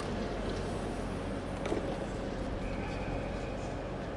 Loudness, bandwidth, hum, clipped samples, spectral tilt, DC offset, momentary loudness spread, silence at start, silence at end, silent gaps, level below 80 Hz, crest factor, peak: -37 LUFS; 11.5 kHz; none; under 0.1%; -6.5 dB/octave; under 0.1%; 3 LU; 0 s; 0 s; none; -44 dBFS; 18 dB; -18 dBFS